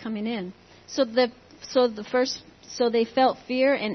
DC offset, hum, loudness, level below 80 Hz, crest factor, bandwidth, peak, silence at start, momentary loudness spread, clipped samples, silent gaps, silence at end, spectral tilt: under 0.1%; none; -25 LUFS; -66 dBFS; 16 dB; 6.4 kHz; -8 dBFS; 0 s; 12 LU; under 0.1%; none; 0 s; -4 dB/octave